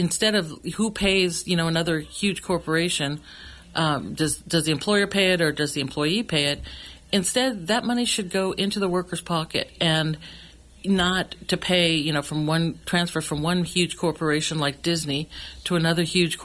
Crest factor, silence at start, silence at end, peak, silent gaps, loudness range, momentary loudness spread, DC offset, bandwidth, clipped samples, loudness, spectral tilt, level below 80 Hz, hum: 16 dB; 0 s; 0 s; -8 dBFS; none; 2 LU; 8 LU; under 0.1%; 12 kHz; under 0.1%; -23 LUFS; -4 dB/octave; -48 dBFS; none